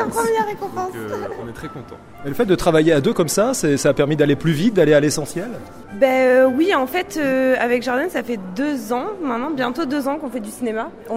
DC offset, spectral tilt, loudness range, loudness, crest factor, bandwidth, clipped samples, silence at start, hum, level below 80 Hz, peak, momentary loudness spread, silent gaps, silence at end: under 0.1%; -5 dB/octave; 4 LU; -19 LUFS; 18 dB; 16 kHz; under 0.1%; 0 s; none; -46 dBFS; -2 dBFS; 15 LU; none; 0 s